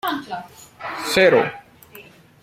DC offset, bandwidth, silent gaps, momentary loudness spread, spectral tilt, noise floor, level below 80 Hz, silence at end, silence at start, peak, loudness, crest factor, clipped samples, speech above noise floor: under 0.1%; 16.5 kHz; none; 19 LU; -4 dB/octave; -45 dBFS; -60 dBFS; 0.4 s; 0.05 s; -2 dBFS; -18 LUFS; 20 dB; under 0.1%; 26 dB